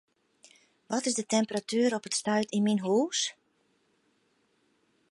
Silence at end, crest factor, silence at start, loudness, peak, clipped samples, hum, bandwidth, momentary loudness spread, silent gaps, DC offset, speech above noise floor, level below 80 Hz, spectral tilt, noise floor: 1.8 s; 18 dB; 0.9 s; -29 LUFS; -14 dBFS; under 0.1%; none; 11.5 kHz; 4 LU; none; under 0.1%; 43 dB; -80 dBFS; -3.5 dB/octave; -71 dBFS